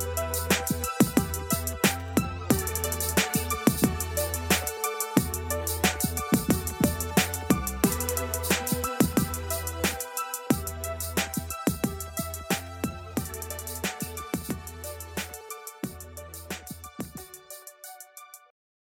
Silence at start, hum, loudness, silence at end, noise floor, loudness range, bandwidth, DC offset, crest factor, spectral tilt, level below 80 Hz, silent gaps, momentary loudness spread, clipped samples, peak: 0 s; none; -28 LUFS; 0.5 s; -49 dBFS; 11 LU; 17 kHz; under 0.1%; 26 dB; -4 dB/octave; -42 dBFS; none; 14 LU; under 0.1%; -4 dBFS